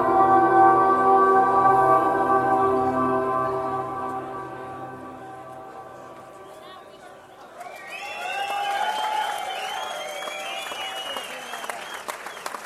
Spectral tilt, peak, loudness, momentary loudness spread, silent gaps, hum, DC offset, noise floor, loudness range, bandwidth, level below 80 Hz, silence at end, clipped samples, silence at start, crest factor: -4.5 dB/octave; -4 dBFS; -22 LUFS; 23 LU; none; none; under 0.1%; -45 dBFS; 20 LU; 14.5 kHz; -60 dBFS; 0 s; under 0.1%; 0 s; 20 dB